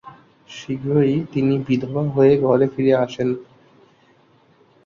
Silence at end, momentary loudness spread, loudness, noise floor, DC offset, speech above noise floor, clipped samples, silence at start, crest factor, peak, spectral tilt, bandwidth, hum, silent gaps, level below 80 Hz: 1.45 s; 14 LU; -19 LUFS; -55 dBFS; under 0.1%; 37 dB; under 0.1%; 0.05 s; 16 dB; -4 dBFS; -8.5 dB/octave; 7.2 kHz; none; none; -56 dBFS